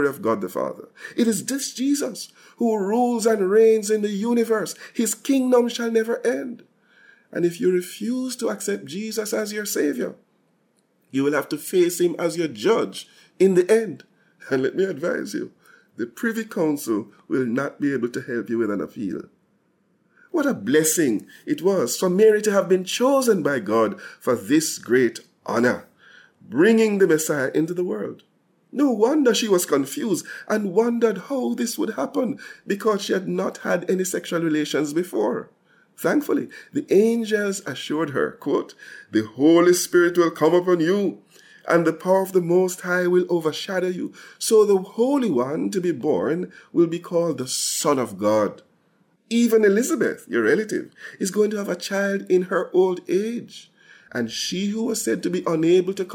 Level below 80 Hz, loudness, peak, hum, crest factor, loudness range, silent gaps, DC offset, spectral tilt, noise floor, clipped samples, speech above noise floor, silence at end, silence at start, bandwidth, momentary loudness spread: -74 dBFS; -22 LUFS; -6 dBFS; none; 16 dB; 6 LU; none; under 0.1%; -4.5 dB/octave; -65 dBFS; under 0.1%; 44 dB; 0 s; 0 s; 17.5 kHz; 11 LU